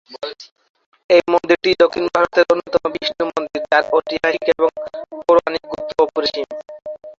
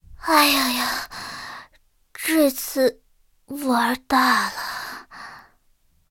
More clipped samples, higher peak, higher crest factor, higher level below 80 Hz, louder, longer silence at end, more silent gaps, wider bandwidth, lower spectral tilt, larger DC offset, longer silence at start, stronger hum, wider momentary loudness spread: neither; about the same, -2 dBFS vs -2 dBFS; second, 16 dB vs 22 dB; about the same, -56 dBFS vs -54 dBFS; first, -17 LUFS vs -21 LUFS; second, 0.05 s vs 0.7 s; first, 0.52-0.56 s, 0.70-0.74 s, 0.86-0.92 s, 1.04-1.09 s vs none; second, 7.4 kHz vs 17 kHz; first, -4.5 dB/octave vs -1.5 dB/octave; neither; about the same, 0.1 s vs 0.1 s; neither; second, 15 LU vs 20 LU